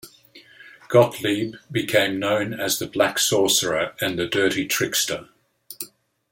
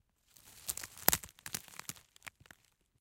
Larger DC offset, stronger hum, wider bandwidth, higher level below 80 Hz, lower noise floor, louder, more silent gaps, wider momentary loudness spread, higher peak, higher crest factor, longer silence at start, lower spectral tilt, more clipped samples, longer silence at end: neither; neither; about the same, 17 kHz vs 17 kHz; about the same, -62 dBFS vs -62 dBFS; second, -50 dBFS vs -65 dBFS; first, -21 LUFS vs -36 LUFS; neither; second, 10 LU vs 22 LU; about the same, -4 dBFS vs -2 dBFS; second, 20 dB vs 40 dB; second, 0.05 s vs 0.45 s; first, -3 dB/octave vs -1 dB/octave; neither; second, 0.45 s vs 0.7 s